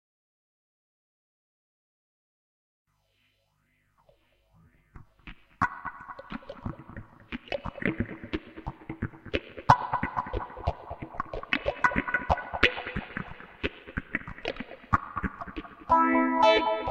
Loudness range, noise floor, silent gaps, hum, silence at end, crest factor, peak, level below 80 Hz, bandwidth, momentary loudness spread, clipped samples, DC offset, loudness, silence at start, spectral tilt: 10 LU; -72 dBFS; none; none; 0 s; 28 dB; -2 dBFS; -46 dBFS; 9.6 kHz; 19 LU; under 0.1%; under 0.1%; -29 LUFS; 4.95 s; -6 dB/octave